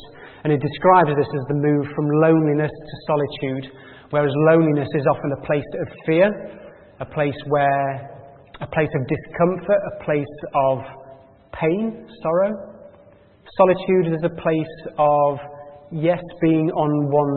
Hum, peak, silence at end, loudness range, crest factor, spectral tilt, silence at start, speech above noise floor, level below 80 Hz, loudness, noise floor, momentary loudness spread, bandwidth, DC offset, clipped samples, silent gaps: none; 0 dBFS; 0 s; 4 LU; 20 dB; -12.5 dB/octave; 0 s; 30 dB; -54 dBFS; -20 LUFS; -50 dBFS; 17 LU; 4.4 kHz; under 0.1%; under 0.1%; none